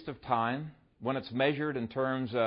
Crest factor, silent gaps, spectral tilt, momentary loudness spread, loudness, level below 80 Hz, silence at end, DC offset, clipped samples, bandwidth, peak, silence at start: 18 dB; none; -10 dB/octave; 9 LU; -33 LUFS; -66 dBFS; 0 s; under 0.1%; under 0.1%; 5.4 kHz; -14 dBFS; 0 s